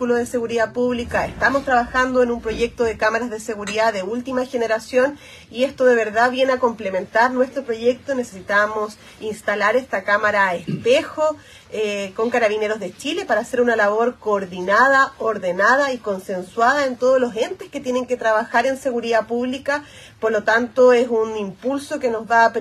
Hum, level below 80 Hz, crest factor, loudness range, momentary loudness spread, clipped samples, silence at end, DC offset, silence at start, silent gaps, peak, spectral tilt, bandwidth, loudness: none; -50 dBFS; 18 dB; 3 LU; 10 LU; under 0.1%; 0 s; under 0.1%; 0 s; none; -2 dBFS; -4 dB/octave; 13 kHz; -19 LUFS